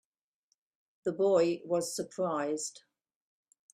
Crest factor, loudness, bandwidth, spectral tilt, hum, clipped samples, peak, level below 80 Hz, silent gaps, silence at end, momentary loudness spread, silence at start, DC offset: 18 dB; -32 LUFS; 15.5 kHz; -4.5 dB/octave; none; under 0.1%; -16 dBFS; -78 dBFS; none; 0.95 s; 11 LU; 1.05 s; under 0.1%